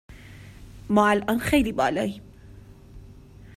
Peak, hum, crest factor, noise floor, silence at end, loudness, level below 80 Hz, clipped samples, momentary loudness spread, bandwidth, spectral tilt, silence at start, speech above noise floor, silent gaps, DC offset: -6 dBFS; none; 20 dB; -46 dBFS; 0.05 s; -23 LUFS; -46 dBFS; under 0.1%; 25 LU; 16 kHz; -5.5 dB/octave; 0.1 s; 24 dB; none; under 0.1%